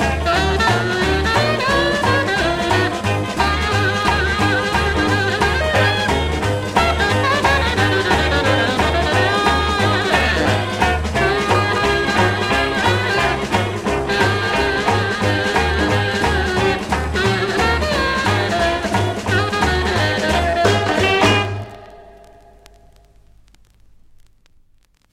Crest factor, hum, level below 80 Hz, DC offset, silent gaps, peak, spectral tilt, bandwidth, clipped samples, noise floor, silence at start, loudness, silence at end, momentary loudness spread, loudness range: 16 dB; none; -30 dBFS; under 0.1%; none; -2 dBFS; -4.5 dB/octave; 16 kHz; under 0.1%; -55 dBFS; 0 s; -17 LUFS; 3 s; 3 LU; 2 LU